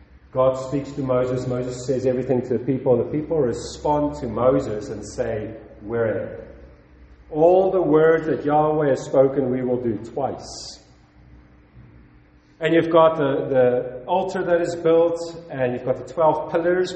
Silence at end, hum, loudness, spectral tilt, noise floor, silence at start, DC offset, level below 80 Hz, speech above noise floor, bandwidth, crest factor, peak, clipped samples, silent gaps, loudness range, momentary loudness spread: 0 s; none; -21 LUFS; -7 dB/octave; -52 dBFS; 0.35 s; under 0.1%; -48 dBFS; 32 dB; 8.6 kHz; 18 dB; -4 dBFS; under 0.1%; none; 6 LU; 13 LU